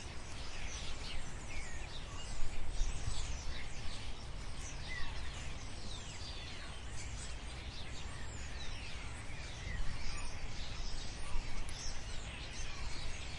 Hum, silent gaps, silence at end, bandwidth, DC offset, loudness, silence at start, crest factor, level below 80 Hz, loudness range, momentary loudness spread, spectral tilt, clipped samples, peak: none; none; 0 s; 11 kHz; under 0.1%; -46 LUFS; 0 s; 18 dB; -44 dBFS; 1 LU; 3 LU; -3 dB/octave; under 0.1%; -20 dBFS